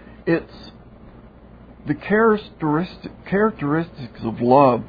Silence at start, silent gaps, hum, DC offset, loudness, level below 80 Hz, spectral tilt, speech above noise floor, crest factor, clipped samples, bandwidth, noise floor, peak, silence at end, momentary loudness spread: 0.25 s; none; none; under 0.1%; -21 LUFS; -48 dBFS; -10 dB/octave; 25 dB; 20 dB; under 0.1%; 5 kHz; -44 dBFS; -2 dBFS; 0 s; 18 LU